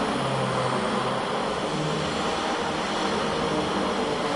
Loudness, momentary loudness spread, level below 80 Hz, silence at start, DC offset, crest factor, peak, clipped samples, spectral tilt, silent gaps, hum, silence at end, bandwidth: -26 LUFS; 1 LU; -52 dBFS; 0 s; under 0.1%; 12 dB; -14 dBFS; under 0.1%; -4.5 dB/octave; none; none; 0 s; 11.5 kHz